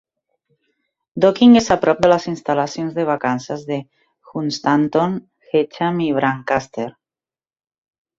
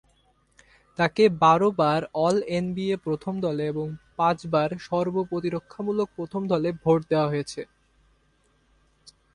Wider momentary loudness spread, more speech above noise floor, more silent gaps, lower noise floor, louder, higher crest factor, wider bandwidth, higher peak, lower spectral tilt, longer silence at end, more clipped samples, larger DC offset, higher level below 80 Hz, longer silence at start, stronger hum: first, 15 LU vs 11 LU; first, over 73 dB vs 41 dB; neither; first, under -90 dBFS vs -65 dBFS; first, -18 LUFS vs -25 LUFS; about the same, 18 dB vs 20 dB; second, 7.6 kHz vs 11 kHz; first, -2 dBFS vs -6 dBFS; about the same, -6 dB/octave vs -6.5 dB/octave; first, 1.3 s vs 0.25 s; neither; neither; first, -54 dBFS vs -60 dBFS; first, 1.15 s vs 1 s; neither